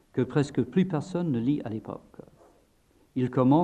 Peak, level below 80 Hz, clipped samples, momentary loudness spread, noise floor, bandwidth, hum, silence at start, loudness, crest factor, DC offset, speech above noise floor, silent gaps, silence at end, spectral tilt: -10 dBFS; -62 dBFS; under 0.1%; 12 LU; -64 dBFS; 9.6 kHz; none; 0.15 s; -28 LUFS; 18 dB; under 0.1%; 38 dB; none; 0 s; -8.5 dB/octave